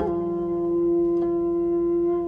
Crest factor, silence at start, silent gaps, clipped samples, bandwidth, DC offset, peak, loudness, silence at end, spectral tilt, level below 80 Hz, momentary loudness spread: 10 dB; 0 s; none; under 0.1%; 2.2 kHz; under 0.1%; -14 dBFS; -23 LUFS; 0 s; -11 dB/octave; -48 dBFS; 4 LU